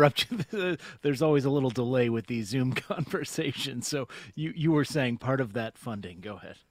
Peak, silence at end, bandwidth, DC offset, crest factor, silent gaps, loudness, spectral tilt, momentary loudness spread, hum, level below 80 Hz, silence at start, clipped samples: -6 dBFS; 0.15 s; 16 kHz; under 0.1%; 24 dB; none; -29 LUFS; -5.5 dB/octave; 13 LU; none; -62 dBFS; 0 s; under 0.1%